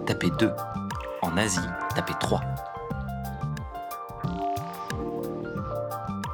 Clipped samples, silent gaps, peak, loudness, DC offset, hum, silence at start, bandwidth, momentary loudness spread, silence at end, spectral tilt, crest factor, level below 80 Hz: under 0.1%; none; -8 dBFS; -30 LUFS; under 0.1%; none; 0 s; over 20 kHz; 9 LU; 0 s; -5 dB/octave; 22 dB; -46 dBFS